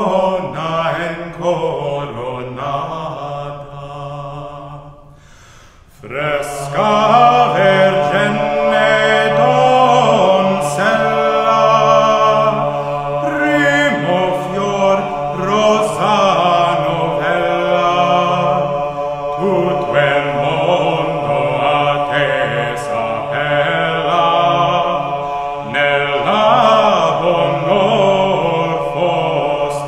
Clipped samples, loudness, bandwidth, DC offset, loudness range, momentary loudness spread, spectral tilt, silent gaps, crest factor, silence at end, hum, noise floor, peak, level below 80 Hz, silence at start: under 0.1%; -14 LUFS; 12.5 kHz; under 0.1%; 10 LU; 11 LU; -5 dB/octave; none; 14 dB; 0 s; none; -42 dBFS; 0 dBFS; -46 dBFS; 0 s